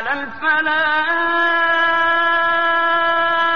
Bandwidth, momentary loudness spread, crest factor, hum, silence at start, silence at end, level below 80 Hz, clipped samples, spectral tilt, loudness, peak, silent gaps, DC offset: 6.6 kHz; 2 LU; 12 dB; none; 0 s; 0 s; -56 dBFS; under 0.1%; 1.5 dB/octave; -16 LUFS; -6 dBFS; none; 1%